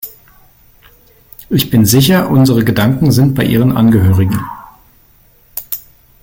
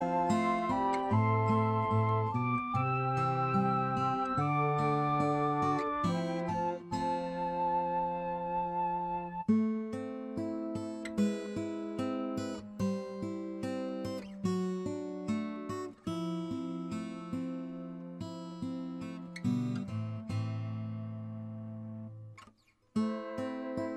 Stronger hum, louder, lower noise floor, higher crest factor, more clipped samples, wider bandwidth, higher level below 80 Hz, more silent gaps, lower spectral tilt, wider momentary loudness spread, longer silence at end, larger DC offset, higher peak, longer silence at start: neither; first, -11 LUFS vs -34 LUFS; second, -47 dBFS vs -65 dBFS; about the same, 12 dB vs 16 dB; neither; first, 17 kHz vs 11.5 kHz; first, -40 dBFS vs -64 dBFS; neither; second, -6 dB/octave vs -7.5 dB/octave; first, 17 LU vs 11 LU; first, 0.45 s vs 0 s; neither; first, 0 dBFS vs -16 dBFS; about the same, 0.05 s vs 0 s